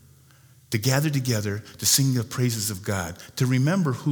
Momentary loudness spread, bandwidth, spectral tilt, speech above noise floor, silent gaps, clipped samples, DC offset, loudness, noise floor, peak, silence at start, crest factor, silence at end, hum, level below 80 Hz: 10 LU; over 20 kHz; -4.5 dB/octave; 30 dB; none; under 0.1%; under 0.1%; -24 LUFS; -54 dBFS; -6 dBFS; 0.7 s; 20 dB; 0 s; none; -58 dBFS